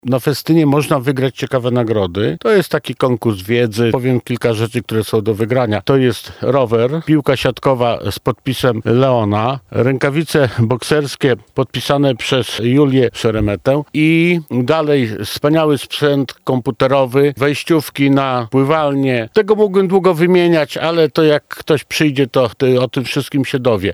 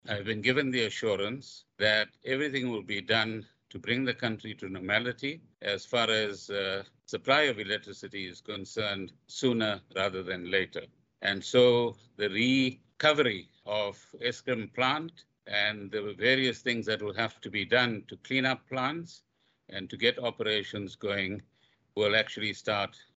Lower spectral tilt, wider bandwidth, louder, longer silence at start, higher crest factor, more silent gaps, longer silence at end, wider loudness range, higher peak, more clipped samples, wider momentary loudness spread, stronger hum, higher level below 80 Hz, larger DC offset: first, -6.5 dB/octave vs -4.5 dB/octave; first, over 20 kHz vs 8.2 kHz; first, -15 LUFS vs -30 LUFS; about the same, 0.05 s vs 0.05 s; second, 14 dB vs 24 dB; neither; second, 0 s vs 0.2 s; about the same, 2 LU vs 4 LU; first, 0 dBFS vs -8 dBFS; neither; second, 6 LU vs 14 LU; neither; first, -46 dBFS vs -72 dBFS; neither